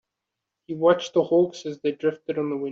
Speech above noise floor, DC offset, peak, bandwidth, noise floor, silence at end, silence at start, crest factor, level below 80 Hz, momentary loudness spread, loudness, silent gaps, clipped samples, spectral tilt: 61 dB; under 0.1%; -6 dBFS; 7.6 kHz; -84 dBFS; 0 s; 0.7 s; 18 dB; -70 dBFS; 8 LU; -24 LUFS; none; under 0.1%; -6 dB/octave